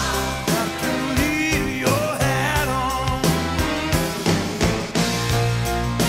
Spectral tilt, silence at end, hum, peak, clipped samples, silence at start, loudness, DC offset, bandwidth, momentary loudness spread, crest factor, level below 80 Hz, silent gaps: -4.5 dB/octave; 0 s; none; -4 dBFS; under 0.1%; 0 s; -21 LUFS; 0.1%; 16 kHz; 2 LU; 16 dB; -32 dBFS; none